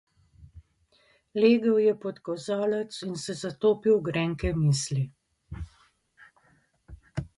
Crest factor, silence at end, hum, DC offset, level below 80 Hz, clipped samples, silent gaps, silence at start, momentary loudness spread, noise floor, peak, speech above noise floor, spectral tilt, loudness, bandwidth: 18 dB; 0.1 s; none; under 0.1%; -48 dBFS; under 0.1%; none; 0.4 s; 18 LU; -66 dBFS; -10 dBFS; 40 dB; -6 dB/octave; -27 LUFS; 11.5 kHz